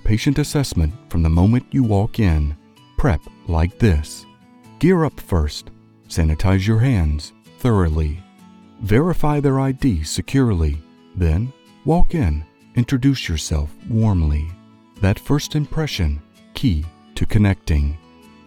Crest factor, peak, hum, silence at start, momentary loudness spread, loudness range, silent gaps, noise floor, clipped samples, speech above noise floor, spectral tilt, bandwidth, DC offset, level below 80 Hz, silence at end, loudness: 16 dB; -4 dBFS; none; 0.05 s; 11 LU; 2 LU; none; -46 dBFS; under 0.1%; 29 dB; -6.5 dB/octave; 16 kHz; under 0.1%; -26 dBFS; 0.5 s; -20 LUFS